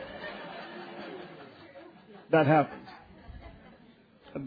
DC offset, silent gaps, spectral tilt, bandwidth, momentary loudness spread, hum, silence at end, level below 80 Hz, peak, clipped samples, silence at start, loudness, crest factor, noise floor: under 0.1%; none; -5.5 dB/octave; 5 kHz; 27 LU; none; 0 s; -60 dBFS; -12 dBFS; under 0.1%; 0 s; -29 LUFS; 20 dB; -58 dBFS